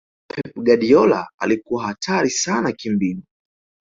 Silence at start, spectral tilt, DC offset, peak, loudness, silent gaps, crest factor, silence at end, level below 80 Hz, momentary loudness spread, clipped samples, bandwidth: 0.35 s; -4.5 dB/octave; under 0.1%; -2 dBFS; -19 LUFS; 1.34-1.38 s; 18 dB; 0.65 s; -58 dBFS; 15 LU; under 0.1%; 7.8 kHz